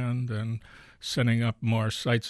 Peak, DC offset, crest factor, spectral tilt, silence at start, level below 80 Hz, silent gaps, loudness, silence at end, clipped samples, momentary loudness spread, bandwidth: -14 dBFS; under 0.1%; 14 dB; -6 dB/octave; 0 s; -60 dBFS; none; -28 LUFS; 0 s; under 0.1%; 11 LU; 12.5 kHz